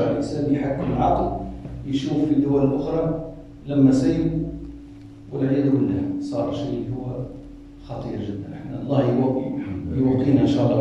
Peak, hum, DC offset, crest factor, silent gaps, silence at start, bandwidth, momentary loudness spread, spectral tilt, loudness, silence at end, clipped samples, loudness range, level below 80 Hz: -4 dBFS; none; under 0.1%; 18 dB; none; 0 s; 8.2 kHz; 17 LU; -8.5 dB/octave; -22 LUFS; 0 s; under 0.1%; 5 LU; -42 dBFS